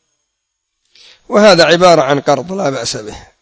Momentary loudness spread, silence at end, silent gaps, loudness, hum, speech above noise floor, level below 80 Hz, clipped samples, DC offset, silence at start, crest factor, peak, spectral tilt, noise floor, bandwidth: 13 LU; 0.25 s; none; -10 LUFS; none; 61 dB; -48 dBFS; 0.5%; under 0.1%; 1.3 s; 12 dB; 0 dBFS; -4 dB/octave; -72 dBFS; 8 kHz